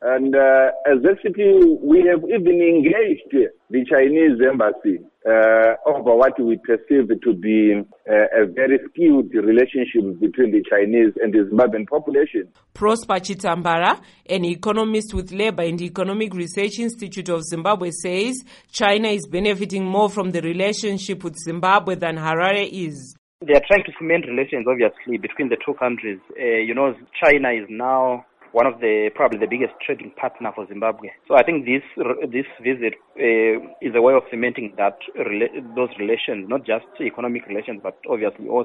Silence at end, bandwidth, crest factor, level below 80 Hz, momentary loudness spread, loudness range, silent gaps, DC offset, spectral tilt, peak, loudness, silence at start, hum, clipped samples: 0 s; 11.5 kHz; 18 dB; -50 dBFS; 11 LU; 6 LU; 23.18-23.39 s; under 0.1%; -5.5 dB/octave; 0 dBFS; -19 LUFS; 0 s; none; under 0.1%